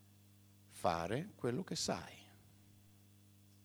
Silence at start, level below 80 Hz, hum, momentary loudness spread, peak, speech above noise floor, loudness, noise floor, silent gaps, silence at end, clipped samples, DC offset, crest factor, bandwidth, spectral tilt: 0.7 s; -70 dBFS; 50 Hz at -65 dBFS; 20 LU; -20 dBFS; 25 dB; -40 LUFS; -65 dBFS; none; 0.75 s; under 0.1%; under 0.1%; 24 dB; over 20 kHz; -4.5 dB/octave